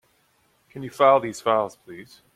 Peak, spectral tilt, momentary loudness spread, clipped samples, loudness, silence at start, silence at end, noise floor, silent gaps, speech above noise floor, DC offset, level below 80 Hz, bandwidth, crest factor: -4 dBFS; -5 dB/octave; 25 LU; under 0.1%; -21 LUFS; 0.75 s; 0.3 s; -65 dBFS; none; 42 dB; under 0.1%; -68 dBFS; 14.5 kHz; 20 dB